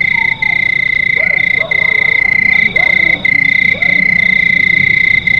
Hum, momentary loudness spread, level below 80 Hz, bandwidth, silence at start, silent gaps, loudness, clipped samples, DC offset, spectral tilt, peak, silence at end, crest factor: none; 2 LU; -40 dBFS; 6.8 kHz; 0 s; none; -8 LUFS; under 0.1%; 0.6%; -4.5 dB/octave; 0 dBFS; 0 s; 10 dB